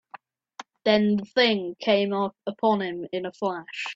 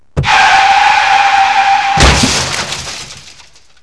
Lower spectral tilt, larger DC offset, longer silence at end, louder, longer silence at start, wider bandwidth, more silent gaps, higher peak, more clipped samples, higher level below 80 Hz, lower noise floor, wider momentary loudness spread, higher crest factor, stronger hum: first, -6 dB/octave vs -2.5 dB/octave; second, under 0.1% vs 0.7%; second, 0 s vs 0.65 s; second, -25 LUFS vs -8 LUFS; about the same, 0.15 s vs 0.15 s; second, 7.8 kHz vs 11 kHz; neither; second, -6 dBFS vs 0 dBFS; neither; second, -68 dBFS vs -24 dBFS; first, -49 dBFS vs -41 dBFS; second, 10 LU vs 13 LU; first, 18 dB vs 10 dB; neither